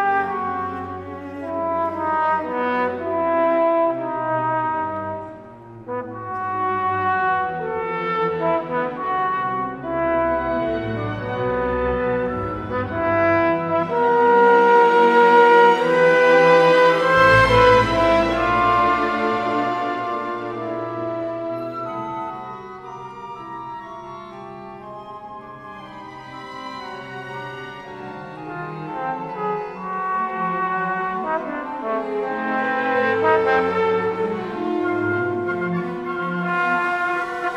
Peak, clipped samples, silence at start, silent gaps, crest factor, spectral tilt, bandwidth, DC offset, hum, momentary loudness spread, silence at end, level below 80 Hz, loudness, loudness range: -2 dBFS; under 0.1%; 0 s; none; 18 dB; -6.5 dB/octave; 10 kHz; under 0.1%; none; 21 LU; 0 s; -46 dBFS; -19 LUFS; 19 LU